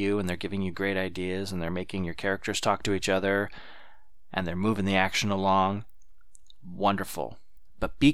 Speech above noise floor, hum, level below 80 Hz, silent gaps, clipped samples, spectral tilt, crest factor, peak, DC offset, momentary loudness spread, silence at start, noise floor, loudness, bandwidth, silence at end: 31 dB; none; -50 dBFS; none; under 0.1%; -5 dB/octave; 22 dB; -6 dBFS; 1%; 12 LU; 0 s; -59 dBFS; -28 LUFS; 16 kHz; 0 s